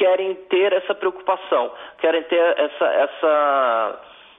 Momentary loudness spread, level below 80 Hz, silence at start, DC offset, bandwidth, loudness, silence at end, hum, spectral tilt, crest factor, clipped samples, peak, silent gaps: 6 LU; -70 dBFS; 0 s; under 0.1%; 3.8 kHz; -20 LUFS; 0.35 s; none; -5.5 dB/octave; 14 dB; under 0.1%; -6 dBFS; none